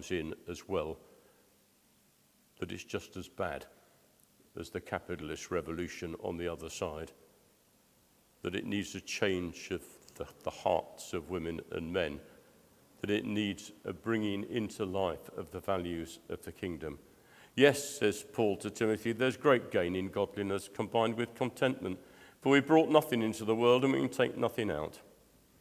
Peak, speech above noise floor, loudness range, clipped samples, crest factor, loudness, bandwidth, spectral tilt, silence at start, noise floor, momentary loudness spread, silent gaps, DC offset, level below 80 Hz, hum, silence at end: -8 dBFS; 35 dB; 12 LU; under 0.1%; 26 dB; -34 LUFS; 16 kHz; -5 dB/octave; 0 s; -68 dBFS; 16 LU; none; under 0.1%; -60 dBFS; none; 0.6 s